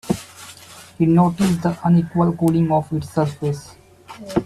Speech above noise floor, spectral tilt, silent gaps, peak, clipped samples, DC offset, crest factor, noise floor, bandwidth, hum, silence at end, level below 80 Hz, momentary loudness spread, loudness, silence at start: 24 dB; -7.5 dB/octave; none; -4 dBFS; under 0.1%; under 0.1%; 16 dB; -42 dBFS; 13.5 kHz; none; 0 s; -50 dBFS; 22 LU; -19 LUFS; 0.05 s